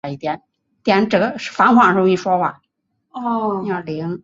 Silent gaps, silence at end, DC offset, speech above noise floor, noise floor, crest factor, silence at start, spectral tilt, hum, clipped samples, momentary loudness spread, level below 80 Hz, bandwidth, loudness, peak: none; 0.05 s; under 0.1%; 53 dB; -70 dBFS; 16 dB; 0.05 s; -6.5 dB/octave; none; under 0.1%; 14 LU; -60 dBFS; 7.8 kHz; -17 LUFS; -2 dBFS